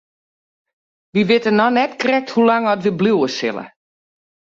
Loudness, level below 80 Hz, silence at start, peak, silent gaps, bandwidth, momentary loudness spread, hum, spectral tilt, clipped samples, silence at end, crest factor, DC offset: -17 LUFS; -62 dBFS; 1.15 s; -2 dBFS; none; 7.6 kHz; 8 LU; none; -6 dB/octave; under 0.1%; 0.9 s; 16 dB; under 0.1%